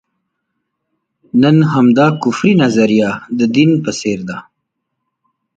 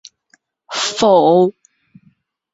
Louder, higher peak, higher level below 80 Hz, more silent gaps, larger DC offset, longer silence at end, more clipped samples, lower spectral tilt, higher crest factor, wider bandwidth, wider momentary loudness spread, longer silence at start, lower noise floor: about the same, -12 LUFS vs -14 LUFS; about the same, 0 dBFS vs -2 dBFS; first, -54 dBFS vs -60 dBFS; neither; neither; about the same, 1.15 s vs 1.05 s; neither; first, -6.5 dB/octave vs -4.5 dB/octave; about the same, 14 dB vs 16 dB; first, 9 kHz vs 8 kHz; about the same, 9 LU vs 10 LU; first, 1.35 s vs 0.7 s; first, -73 dBFS vs -59 dBFS